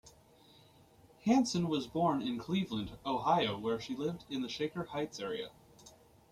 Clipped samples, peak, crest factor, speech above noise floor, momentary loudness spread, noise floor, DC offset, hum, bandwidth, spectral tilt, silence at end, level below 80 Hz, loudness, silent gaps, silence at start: under 0.1%; -16 dBFS; 20 dB; 28 dB; 9 LU; -62 dBFS; under 0.1%; none; 15 kHz; -5.5 dB/octave; 0.4 s; -66 dBFS; -35 LUFS; none; 0.05 s